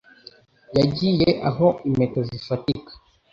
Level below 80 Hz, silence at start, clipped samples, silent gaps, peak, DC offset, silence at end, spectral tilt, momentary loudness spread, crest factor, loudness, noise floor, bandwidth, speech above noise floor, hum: -50 dBFS; 0.7 s; under 0.1%; none; -4 dBFS; under 0.1%; 0.4 s; -8 dB/octave; 8 LU; 18 dB; -22 LUFS; -50 dBFS; 7.4 kHz; 29 dB; none